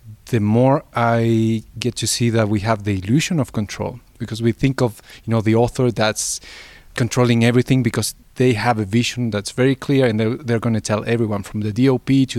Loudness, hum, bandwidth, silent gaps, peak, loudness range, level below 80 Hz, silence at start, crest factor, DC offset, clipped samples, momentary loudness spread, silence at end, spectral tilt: -19 LUFS; none; 14.5 kHz; none; 0 dBFS; 2 LU; -46 dBFS; 0.05 s; 18 dB; under 0.1%; under 0.1%; 9 LU; 0 s; -5.5 dB/octave